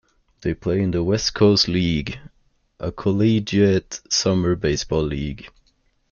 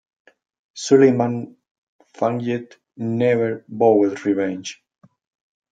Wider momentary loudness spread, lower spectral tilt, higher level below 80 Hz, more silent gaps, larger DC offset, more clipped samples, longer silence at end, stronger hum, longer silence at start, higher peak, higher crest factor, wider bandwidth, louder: about the same, 14 LU vs 16 LU; second, -5 dB/octave vs -6.5 dB/octave; first, -42 dBFS vs -70 dBFS; second, none vs 1.71-1.99 s; neither; neither; second, 0.65 s vs 1 s; neither; second, 0.4 s vs 0.75 s; second, -6 dBFS vs -2 dBFS; about the same, 16 dB vs 18 dB; second, 7.2 kHz vs 9.2 kHz; about the same, -20 LUFS vs -20 LUFS